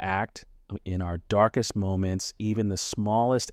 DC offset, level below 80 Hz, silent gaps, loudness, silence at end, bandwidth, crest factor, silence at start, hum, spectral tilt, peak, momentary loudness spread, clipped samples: under 0.1%; -50 dBFS; none; -27 LUFS; 0 s; 15 kHz; 18 dB; 0 s; none; -5.5 dB/octave; -8 dBFS; 12 LU; under 0.1%